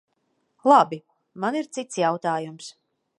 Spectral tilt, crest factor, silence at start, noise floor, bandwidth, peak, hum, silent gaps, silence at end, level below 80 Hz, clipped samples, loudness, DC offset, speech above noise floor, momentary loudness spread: -5 dB/octave; 22 dB; 0.65 s; -72 dBFS; 11.5 kHz; -2 dBFS; none; none; 0.5 s; -80 dBFS; under 0.1%; -23 LUFS; under 0.1%; 50 dB; 20 LU